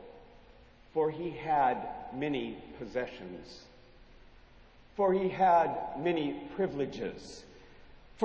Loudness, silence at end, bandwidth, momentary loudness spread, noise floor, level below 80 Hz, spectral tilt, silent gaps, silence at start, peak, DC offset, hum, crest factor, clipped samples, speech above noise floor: -32 LUFS; 0 s; 8 kHz; 20 LU; -57 dBFS; -60 dBFS; -6.5 dB/octave; none; 0 s; -16 dBFS; under 0.1%; none; 18 dB; under 0.1%; 25 dB